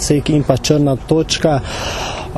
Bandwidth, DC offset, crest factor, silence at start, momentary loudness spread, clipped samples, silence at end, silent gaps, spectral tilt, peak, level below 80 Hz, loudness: 13 kHz; under 0.1%; 16 dB; 0 s; 7 LU; under 0.1%; 0 s; none; -5 dB/octave; 0 dBFS; -32 dBFS; -16 LUFS